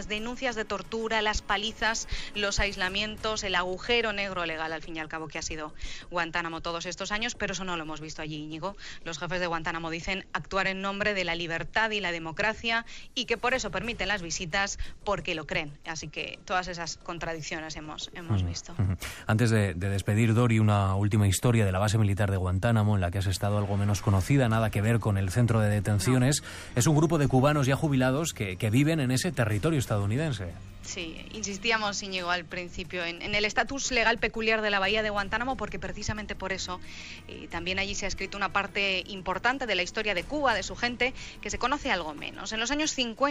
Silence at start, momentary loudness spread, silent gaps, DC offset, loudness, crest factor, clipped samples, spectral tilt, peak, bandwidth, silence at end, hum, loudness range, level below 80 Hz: 0 s; 11 LU; none; under 0.1%; -28 LUFS; 16 dB; under 0.1%; -4.5 dB/octave; -12 dBFS; 15.5 kHz; 0 s; none; 7 LU; -46 dBFS